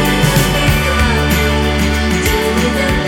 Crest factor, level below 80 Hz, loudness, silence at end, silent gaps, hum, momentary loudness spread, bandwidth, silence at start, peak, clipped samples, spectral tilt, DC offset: 12 dB; -20 dBFS; -13 LUFS; 0 s; none; none; 2 LU; 18 kHz; 0 s; 0 dBFS; under 0.1%; -4.5 dB/octave; under 0.1%